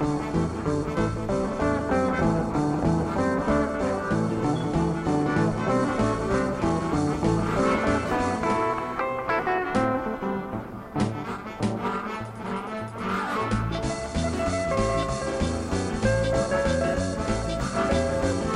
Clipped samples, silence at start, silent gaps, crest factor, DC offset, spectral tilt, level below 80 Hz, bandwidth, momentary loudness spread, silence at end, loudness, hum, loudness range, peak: under 0.1%; 0 s; none; 16 dB; under 0.1%; -6.5 dB/octave; -38 dBFS; 11.5 kHz; 6 LU; 0 s; -26 LUFS; none; 5 LU; -10 dBFS